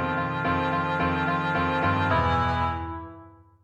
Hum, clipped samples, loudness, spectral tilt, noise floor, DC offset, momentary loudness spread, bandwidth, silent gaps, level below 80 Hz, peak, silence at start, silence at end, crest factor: none; under 0.1%; -25 LUFS; -7.5 dB/octave; -49 dBFS; under 0.1%; 10 LU; 8.6 kHz; none; -42 dBFS; -12 dBFS; 0 s; 0.35 s; 14 dB